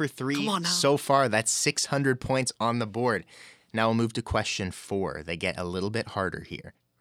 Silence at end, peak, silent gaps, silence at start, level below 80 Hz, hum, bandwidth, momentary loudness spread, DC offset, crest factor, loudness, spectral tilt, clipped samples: 0.3 s; -8 dBFS; none; 0 s; -52 dBFS; none; 16.5 kHz; 9 LU; under 0.1%; 20 dB; -27 LUFS; -4 dB/octave; under 0.1%